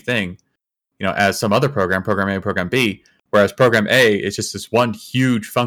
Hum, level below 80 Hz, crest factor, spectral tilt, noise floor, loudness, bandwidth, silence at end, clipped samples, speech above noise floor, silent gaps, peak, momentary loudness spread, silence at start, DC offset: none; -58 dBFS; 16 dB; -5 dB/octave; -76 dBFS; -17 LUFS; over 20 kHz; 0 s; under 0.1%; 58 dB; none; -2 dBFS; 9 LU; 0.05 s; under 0.1%